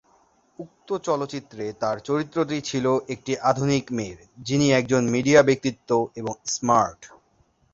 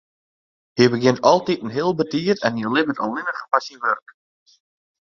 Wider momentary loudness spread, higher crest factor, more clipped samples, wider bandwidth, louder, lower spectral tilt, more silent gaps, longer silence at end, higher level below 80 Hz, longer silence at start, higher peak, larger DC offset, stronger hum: first, 14 LU vs 8 LU; about the same, 22 dB vs 20 dB; neither; about the same, 8 kHz vs 7.4 kHz; second, -23 LUFS vs -20 LUFS; about the same, -5 dB/octave vs -5.5 dB/octave; neither; second, 0.65 s vs 1.05 s; about the same, -58 dBFS vs -62 dBFS; second, 0.6 s vs 0.75 s; about the same, -2 dBFS vs 0 dBFS; neither; neither